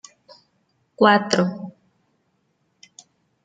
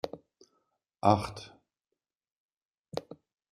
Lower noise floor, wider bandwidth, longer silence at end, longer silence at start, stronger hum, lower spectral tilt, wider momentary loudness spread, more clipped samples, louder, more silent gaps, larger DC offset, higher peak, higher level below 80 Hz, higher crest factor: second, -69 dBFS vs -88 dBFS; second, 9.4 kHz vs 14 kHz; first, 1.75 s vs 0.4 s; first, 1 s vs 0.05 s; neither; second, -5 dB/octave vs -6.5 dB/octave; about the same, 21 LU vs 23 LU; neither; first, -18 LUFS vs -31 LUFS; second, none vs 2.31-2.49 s, 2.57-2.69 s, 2.79-2.84 s; neither; first, -2 dBFS vs -8 dBFS; second, -70 dBFS vs -64 dBFS; second, 22 dB vs 28 dB